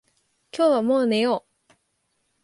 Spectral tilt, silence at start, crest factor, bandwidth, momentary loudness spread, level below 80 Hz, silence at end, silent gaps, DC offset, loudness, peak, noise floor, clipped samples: -5.5 dB/octave; 0.55 s; 16 dB; 11.5 kHz; 9 LU; -74 dBFS; 1.05 s; none; under 0.1%; -22 LUFS; -10 dBFS; -72 dBFS; under 0.1%